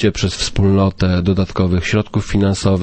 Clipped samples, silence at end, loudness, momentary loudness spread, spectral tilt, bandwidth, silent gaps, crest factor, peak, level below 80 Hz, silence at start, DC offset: under 0.1%; 0 s; -16 LUFS; 4 LU; -6 dB/octave; 8.8 kHz; none; 14 dB; -2 dBFS; -30 dBFS; 0 s; under 0.1%